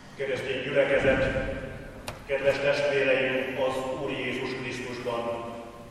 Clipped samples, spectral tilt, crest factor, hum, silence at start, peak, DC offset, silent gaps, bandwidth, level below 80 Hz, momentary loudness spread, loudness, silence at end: under 0.1%; -5 dB/octave; 18 dB; none; 0 s; -10 dBFS; under 0.1%; none; 13.5 kHz; -48 dBFS; 14 LU; -27 LUFS; 0 s